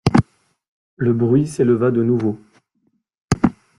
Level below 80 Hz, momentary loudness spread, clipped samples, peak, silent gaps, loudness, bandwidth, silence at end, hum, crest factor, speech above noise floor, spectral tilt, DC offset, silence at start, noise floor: -44 dBFS; 8 LU; under 0.1%; -2 dBFS; 0.68-0.97 s, 3.21-3.28 s; -18 LUFS; 11.5 kHz; 0.25 s; none; 18 dB; 50 dB; -7.5 dB/octave; under 0.1%; 0.05 s; -67 dBFS